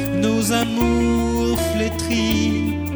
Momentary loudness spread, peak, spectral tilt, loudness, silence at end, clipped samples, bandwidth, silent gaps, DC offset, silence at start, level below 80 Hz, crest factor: 3 LU; -4 dBFS; -5 dB/octave; -19 LUFS; 0 s; under 0.1%; over 20 kHz; none; under 0.1%; 0 s; -30 dBFS; 14 dB